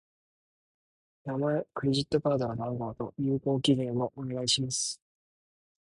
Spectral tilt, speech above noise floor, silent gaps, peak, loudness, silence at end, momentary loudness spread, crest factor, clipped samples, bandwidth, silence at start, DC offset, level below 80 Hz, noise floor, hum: -5 dB/octave; over 60 dB; none; -12 dBFS; -30 LUFS; 0.95 s; 8 LU; 20 dB; under 0.1%; 11.5 kHz; 1.25 s; under 0.1%; -62 dBFS; under -90 dBFS; none